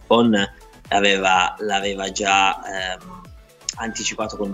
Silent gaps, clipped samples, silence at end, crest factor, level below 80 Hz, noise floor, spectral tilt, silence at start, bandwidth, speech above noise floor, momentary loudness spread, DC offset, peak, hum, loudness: none; under 0.1%; 0 s; 18 dB; -48 dBFS; -44 dBFS; -3 dB/octave; 0 s; 14 kHz; 24 dB; 11 LU; under 0.1%; -2 dBFS; none; -20 LUFS